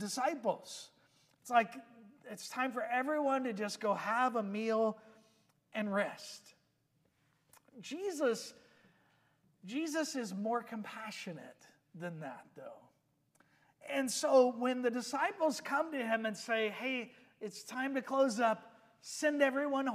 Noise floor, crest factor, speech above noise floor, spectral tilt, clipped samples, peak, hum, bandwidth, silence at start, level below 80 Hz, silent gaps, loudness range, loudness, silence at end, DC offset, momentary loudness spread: -77 dBFS; 22 dB; 41 dB; -4 dB/octave; under 0.1%; -14 dBFS; none; 15.5 kHz; 0 s; under -90 dBFS; none; 9 LU; -35 LUFS; 0 s; under 0.1%; 19 LU